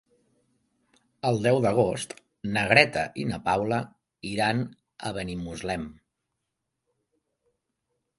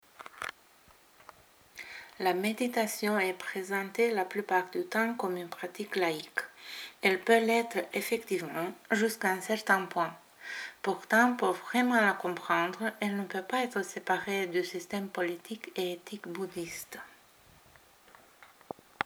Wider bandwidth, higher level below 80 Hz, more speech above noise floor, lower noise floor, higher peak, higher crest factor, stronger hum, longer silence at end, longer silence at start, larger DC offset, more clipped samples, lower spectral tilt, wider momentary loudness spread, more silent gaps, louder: second, 11.5 kHz vs over 20 kHz; first, -56 dBFS vs -78 dBFS; first, 57 dB vs 29 dB; first, -82 dBFS vs -61 dBFS; first, 0 dBFS vs -8 dBFS; about the same, 28 dB vs 24 dB; neither; first, 2.25 s vs 0 s; first, 1.25 s vs 0.2 s; neither; neither; about the same, -5 dB/octave vs -4 dB/octave; about the same, 18 LU vs 16 LU; neither; first, -26 LUFS vs -31 LUFS